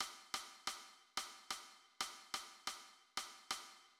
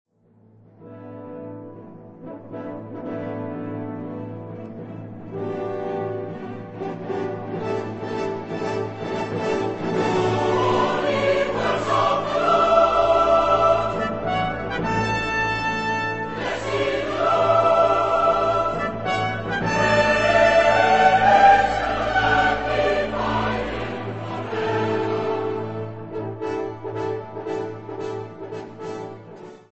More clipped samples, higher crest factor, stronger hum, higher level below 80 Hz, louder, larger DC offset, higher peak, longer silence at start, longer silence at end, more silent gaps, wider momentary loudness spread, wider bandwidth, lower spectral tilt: neither; about the same, 22 dB vs 18 dB; neither; second, -82 dBFS vs -46 dBFS; second, -47 LUFS vs -21 LUFS; second, under 0.1% vs 0.4%; second, -28 dBFS vs -4 dBFS; second, 0 s vs 0.8 s; about the same, 0.05 s vs 0.1 s; neither; second, 4 LU vs 18 LU; first, 16.5 kHz vs 8.4 kHz; second, 1.5 dB/octave vs -5.5 dB/octave